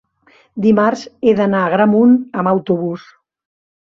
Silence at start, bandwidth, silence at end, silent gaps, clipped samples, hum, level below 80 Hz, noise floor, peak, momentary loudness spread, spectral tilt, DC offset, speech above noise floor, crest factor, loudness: 0.55 s; 7.2 kHz; 0.9 s; none; under 0.1%; none; -58 dBFS; -52 dBFS; -2 dBFS; 9 LU; -8 dB/octave; under 0.1%; 39 dB; 14 dB; -14 LUFS